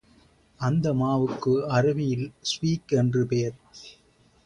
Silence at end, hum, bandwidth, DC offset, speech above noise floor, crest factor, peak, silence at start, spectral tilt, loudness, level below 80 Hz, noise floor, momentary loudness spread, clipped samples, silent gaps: 0.55 s; none; 10.5 kHz; under 0.1%; 34 dB; 16 dB; -10 dBFS; 0.6 s; -6.5 dB/octave; -25 LUFS; -56 dBFS; -59 dBFS; 9 LU; under 0.1%; none